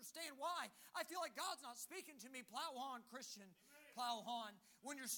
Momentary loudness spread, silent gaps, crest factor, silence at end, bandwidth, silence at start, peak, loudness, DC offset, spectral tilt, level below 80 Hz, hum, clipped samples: 10 LU; none; 20 dB; 0 s; 19.5 kHz; 0 s; -32 dBFS; -50 LUFS; under 0.1%; -1 dB/octave; under -90 dBFS; none; under 0.1%